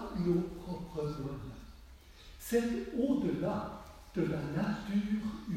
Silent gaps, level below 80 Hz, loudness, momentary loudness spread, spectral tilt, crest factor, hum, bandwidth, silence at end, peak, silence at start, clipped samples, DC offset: none; -54 dBFS; -35 LUFS; 16 LU; -7 dB/octave; 16 dB; none; 16 kHz; 0 s; -18 dBFS; 0 s; under 0.1%; under 0.1%